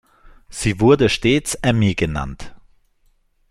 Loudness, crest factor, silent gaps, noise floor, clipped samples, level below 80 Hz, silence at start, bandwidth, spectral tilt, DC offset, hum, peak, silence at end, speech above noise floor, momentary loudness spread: -18 LUFS; 18 dB; none; -60 dBFS; under 0.1%; -38 dBFS; 0.5 s; 16 kHz; -5.5 dB/octave; under 0.1%; none; -2 dBFS; 0.95 s; 43 dB; 17 LU